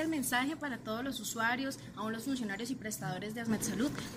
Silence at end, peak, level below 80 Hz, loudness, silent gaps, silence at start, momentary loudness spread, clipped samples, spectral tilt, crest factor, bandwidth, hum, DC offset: 0 s; -18 dBFS; -64 dBFS; -36 LUFS; none; 0 s; 7 LU; under 0.1%; -3.5 dB/octave; 18 dB; 16 kHz; none; under 0.1%